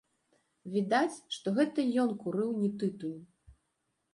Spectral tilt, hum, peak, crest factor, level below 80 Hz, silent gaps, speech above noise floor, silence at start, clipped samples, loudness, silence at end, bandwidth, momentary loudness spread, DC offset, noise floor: -6 dB/octave; none; -14 dBFS; 18 dB; -72 dBFS; none; 49 dB; 0.65 s; under 0.1%; -32 LUFS; 0.6 s; 11.5 kHz; 12 LU; under 0.1%; -80 dBFS